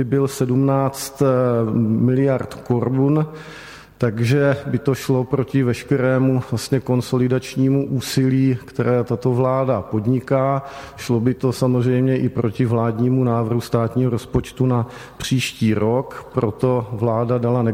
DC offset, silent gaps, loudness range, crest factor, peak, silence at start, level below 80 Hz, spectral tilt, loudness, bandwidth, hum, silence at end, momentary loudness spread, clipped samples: under 0.1%; none; 1 LU; 14 dB; -4 dBFS; 0 s; -48 dBFS; -7 dB/octave; -19 LUFS; 16 kHz; none; 0 s; 6 LU; under 0.1%